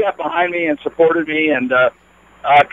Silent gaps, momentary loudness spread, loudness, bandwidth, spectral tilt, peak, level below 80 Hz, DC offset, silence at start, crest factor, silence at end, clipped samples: none; 5 LU; -16 LUFS; 7.4 kHz; -6.5 dB/octave; 0 dBFS; -56 dBFS; under 0.1%; 0 s; 16 dB; 0.05 s; under 0.1%